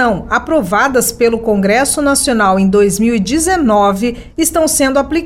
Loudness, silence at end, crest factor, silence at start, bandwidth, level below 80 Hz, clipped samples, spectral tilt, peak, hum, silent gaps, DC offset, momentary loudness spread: -12 LUFS; 0 s; 12 dB; 0 s; 16.5 kHz; -34 dBFS; under 0.1%; -4 dB/octave; 0 dBFS; none; none; under 0.1%; 4 LU